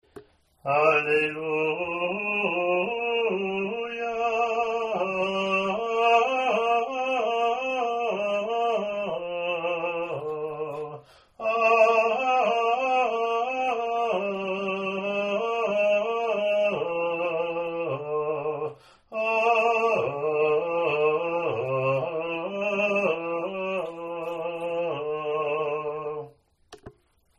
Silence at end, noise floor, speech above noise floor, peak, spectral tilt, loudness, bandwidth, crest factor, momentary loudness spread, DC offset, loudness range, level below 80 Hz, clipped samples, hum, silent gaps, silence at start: 0.5 s; -58 dBFS; 33 dB; -6 dBFS; -5 dB/octave; -26 LUFS; 9.2 kHz; 20 dB; 10 LU; under 0.1%; 4 LU; -68 dBFS; under 0.1%; none; none; 0.15 s